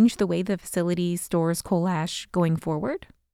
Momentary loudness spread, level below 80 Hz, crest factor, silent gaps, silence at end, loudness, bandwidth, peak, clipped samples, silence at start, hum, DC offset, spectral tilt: 4 LU; -54 dBFS; 14 dB; none; 0.35 s; -26 LUFS; 16 kHz; -10 dBFS; under 0.1%; 0 s; none; under 0.1%; -6 dB/octave